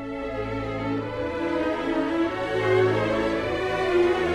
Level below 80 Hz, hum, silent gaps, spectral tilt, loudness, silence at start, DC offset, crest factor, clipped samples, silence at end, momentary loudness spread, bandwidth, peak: -46 dBFS; none; none; -6.5 dB/octave; -25 LUFS; 0 s; under 0.1%; 14 dB; under 0.1%; 0 s; 8 LU; 11 kHz; -10 dBFS